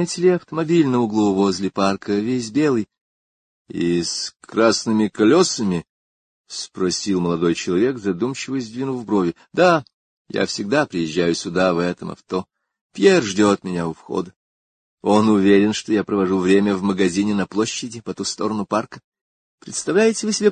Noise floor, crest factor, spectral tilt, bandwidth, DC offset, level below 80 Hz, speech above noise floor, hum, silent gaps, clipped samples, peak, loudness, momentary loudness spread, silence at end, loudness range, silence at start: under -90 dBFS; 18 dB; -5 dB/octave; 9.6 kHz; under 0.1%; -54 dBFS; over 71 dB; none; 3.01-3.65 s, 5.89-6.44 s, 9.94-10.25 s, 12.81-12.90 s, 14.36-14.98 s, 19.04-19.12 s, 19.21-19.58 s; under 0.1%; -2 dBFS; -19 LUFS; 12 LU; 0 s; 4 LU; 0 s